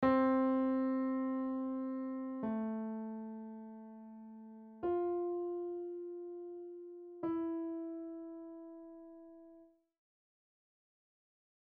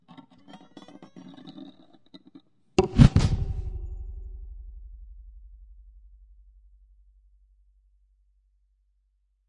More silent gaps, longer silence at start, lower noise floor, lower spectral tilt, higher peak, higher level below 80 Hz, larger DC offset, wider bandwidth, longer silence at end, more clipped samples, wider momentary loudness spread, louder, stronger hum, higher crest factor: neither; second, 0 s vs 0.55 s; second, -63 dBFS vs -70 dBFS; about the same, -6.5 dB/octave vs -7.5 dB/octave; second, -20 dBFS vs -2 dBFS; second, -74 dBFS vs -36 dBFS; neither; second, 4.6 kHz vs 10.5 kHz; second, 2 s vs 4.1 s; neither; second, 20 LU vs 30 LU; second, -38 LUFS vs -24 LUFS; neither; second, 18 dB vs 28 dB